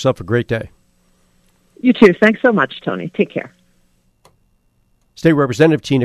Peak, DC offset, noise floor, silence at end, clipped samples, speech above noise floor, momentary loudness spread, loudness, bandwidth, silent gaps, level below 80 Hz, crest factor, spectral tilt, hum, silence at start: 0 dBFS; under 0.1%; -59 dBFS; 0 s; 0.1%; 45 dB; 13 LU; -15 LUFS; 13 kHz; none; -50 dBFS; 16 dB; -7 dB/octave; none; 0 s